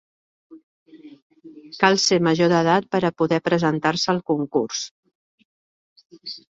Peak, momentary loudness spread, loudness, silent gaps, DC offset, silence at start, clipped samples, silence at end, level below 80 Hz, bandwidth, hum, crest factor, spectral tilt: -2 dBFS; 18 LU; -20 LUFS; 0.63-0.86 s, 1.22-1.30 s, 4.91-5.03 s, 5.15-5.38 s, 5.45-5.96 s; under 0.1%; 0.5 s; under 0.1%; 0.15 s; -64 dBFS; 8 kHz; none; 20 dB; -4.5 dB/octave